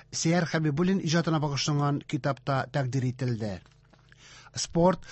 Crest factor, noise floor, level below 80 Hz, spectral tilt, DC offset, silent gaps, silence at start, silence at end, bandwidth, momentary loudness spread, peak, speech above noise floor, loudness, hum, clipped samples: 16 dB; -57 dBFS; -54 dBFS; -5.5 dB/octave; under 0.1%; none; 0.1 s; 0 s; 8.4 kHz; 9 LU; -12 dBFS; 30 dB; -28 LUFS; none; under 0.1%